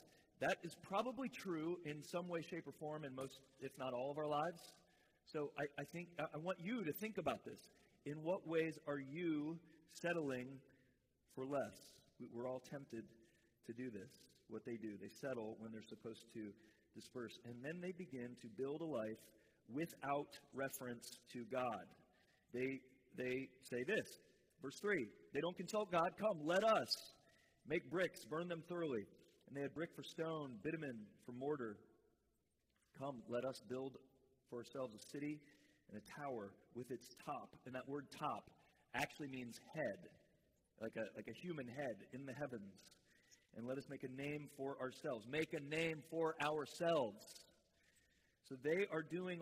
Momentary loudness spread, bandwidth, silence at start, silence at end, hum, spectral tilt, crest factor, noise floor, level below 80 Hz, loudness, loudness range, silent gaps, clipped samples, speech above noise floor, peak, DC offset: 14 LU; 15.5 kHz; 0 s; 0 s; none; -5 dB/octave; 22 dB; -84 dBFS; -84 dBFS; -46 LUFS; 10 LU; none; under 0.1%; 38 dB; -26 dBFS; under 0.1%